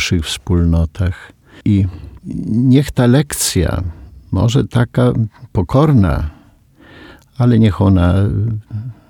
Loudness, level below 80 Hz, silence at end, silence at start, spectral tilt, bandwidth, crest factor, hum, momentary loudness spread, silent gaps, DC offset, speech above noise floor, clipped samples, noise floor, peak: -15 LUFS; -30 dBFS; 0.15 s; 0 s; -6.5 dB/octave; 18 kHz; 14 dB; none; 12 LU; none; under 0.1%; 32 dB; under 0.1%; -46 dBFS; 0 dBFS